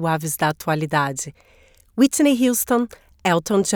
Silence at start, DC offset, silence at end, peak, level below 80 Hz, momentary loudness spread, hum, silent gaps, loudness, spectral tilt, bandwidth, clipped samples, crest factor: 0 s; under 0.1%; 0 s; -4 dBFS; -54 dBFS; 13 LU; none; none; -20 LUFS; -4.5 dB/octave; over 20 kHz; under 0.1%; 16 dB